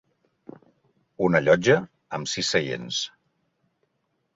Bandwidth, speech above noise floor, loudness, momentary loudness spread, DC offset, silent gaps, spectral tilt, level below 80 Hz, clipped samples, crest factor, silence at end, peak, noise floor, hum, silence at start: 8 kHz; 52 dB; -23 LUFS; 13 LU; under 0.1%; none; -4 dB/octave; -62 dBFS; under 0.1%; 22 dB; 1.25 s; -6 dBFS; -74 dBFS; none; 1.2 s